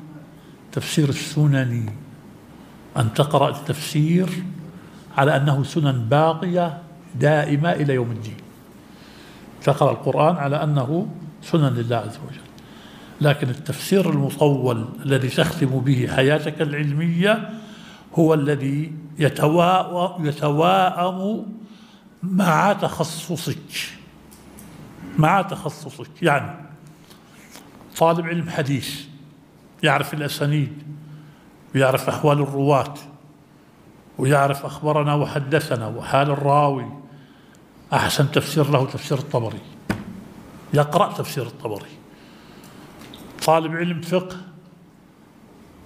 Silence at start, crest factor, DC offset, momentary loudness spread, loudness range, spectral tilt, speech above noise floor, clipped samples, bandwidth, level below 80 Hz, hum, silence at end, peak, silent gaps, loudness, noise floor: 0 s; 22 dB; under 0.1%; 19 LU; 5 LU; -6 dB/octave; 30 dB; under 0.1%; 16 kHz; -56 dBFS; none; 1.3 s; 0 dBFS; none; -21 LUFS; -50 dBFS